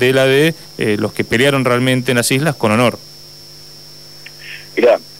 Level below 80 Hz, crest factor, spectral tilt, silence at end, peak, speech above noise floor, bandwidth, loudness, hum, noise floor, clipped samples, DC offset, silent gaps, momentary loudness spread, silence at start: -52 dBFS; 14 dB; -4.5 dB/octave; 0 s; -2 dBFS; 24 dB; 16 kHz; -14 LUFS; 50 Hz at -50 dBFS; -37 dBFS; under 0.1%; 0.5%; none; 22 LU; 0 s